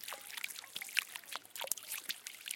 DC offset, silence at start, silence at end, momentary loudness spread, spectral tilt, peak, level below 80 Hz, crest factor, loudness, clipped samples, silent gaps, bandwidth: under 0.1%; 0 s; 0 s; 7 LU; 2.5 dB/octave; -10 dBFS; under -90 dBFS; 34 dB; -40 LUFS; under 0.1%; none; 17 kHz